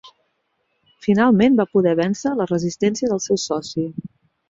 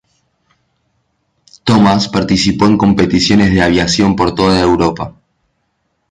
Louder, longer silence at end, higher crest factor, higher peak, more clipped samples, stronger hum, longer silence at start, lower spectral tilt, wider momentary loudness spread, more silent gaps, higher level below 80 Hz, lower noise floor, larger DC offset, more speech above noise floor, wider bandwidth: second, -19 LUFS vs -11 LUFS; second, 0.45 s vs 1 s; about the same, 16 dB vs 14 dB; second, -4 dBFS vs 0 dBFS; neither; neither; second, 0.05 s vs 1.65 s; about the same, -5.5 dB/octave vs -5.5 dB/octave; first, 11 LU vs 5 LU; neither; second, -58 dBFS vs -34 dBFS; first, -70 dBFS vs -65 dBFS; neither; about the same, 52 dB vs 54 dB; second, 7.8 kHz vs 9.8 kHz